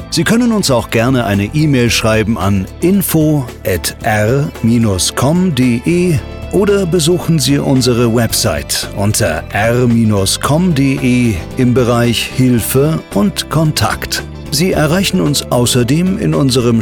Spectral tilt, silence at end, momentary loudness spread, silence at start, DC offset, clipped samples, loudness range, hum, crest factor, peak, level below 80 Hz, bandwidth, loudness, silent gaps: -5 dB/octave; 0 s; 4 LU; 0 s; under 0.1%; under 0.1%; 1 LU; none; 10 dB; -2 dBFS; -32 dBFS; 19 kHz; -12 LUFS; none